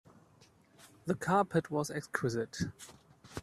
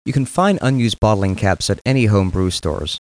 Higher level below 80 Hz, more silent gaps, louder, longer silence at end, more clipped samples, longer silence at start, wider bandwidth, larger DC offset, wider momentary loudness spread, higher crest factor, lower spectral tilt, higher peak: second, -66 dBFS vs -34 dBFS; second, none vs 1.81-1.85 s; second, -34 LUFS vs -17 LUFS; about the same, 0 s vs 0.05 s; neither; first, 0.8 s vs 0.05 s; first, 14.5 kHz vs 10.5 kHz; neither; first, 18 LU vs 4 LU; first, 22 dB vs 14 dB; about the same, -5.5 dB/octave vs -6 dB/octave; second, -14 dBFS vs -4 dBFS